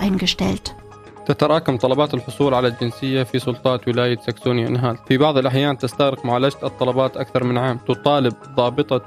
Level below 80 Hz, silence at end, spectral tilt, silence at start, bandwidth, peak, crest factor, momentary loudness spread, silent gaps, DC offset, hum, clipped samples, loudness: -48 dBFS; 0 s; -6.5 dB/octave; 0 s; 14 kHz; 0 dBFS; 18 dB; 5 LU; none; under 0.1%; none; under 0.1%; -19 LUFS